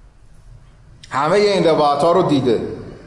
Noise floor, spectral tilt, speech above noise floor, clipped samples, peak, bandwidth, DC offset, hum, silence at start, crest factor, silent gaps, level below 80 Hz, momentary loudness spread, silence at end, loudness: -44 dBFS; -6 dB/octave; 29 dB; under 0.1%; -6 dBFS; 11.5 kHz; under 0.1%; none; 1.05 s; 12 dB; none; -48 dBFS; 8 LU; 0.1 s; -16 LUFS